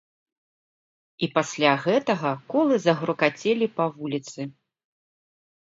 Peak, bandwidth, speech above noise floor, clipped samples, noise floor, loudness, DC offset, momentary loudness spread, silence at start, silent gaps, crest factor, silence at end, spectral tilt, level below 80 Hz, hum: -4 dBFS; 7.8 kHz; over 66 dB; under 0.1%; under -90 dBFS; -24 LUFS; under 0.1%; 10 LU; 1.2 s; none; 22 dB; 1.25 s; -5 dB/octave; -74 dBFS; none